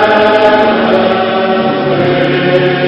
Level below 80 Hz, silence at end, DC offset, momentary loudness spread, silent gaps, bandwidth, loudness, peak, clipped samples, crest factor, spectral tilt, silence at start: -44 dBFS; 0 s; under 0.1%; 4 LU; none; 8 kHz; -10 LUFS; 0 dBFS; 0.7%; 10 dB; -7.5 dB/octave; 0 s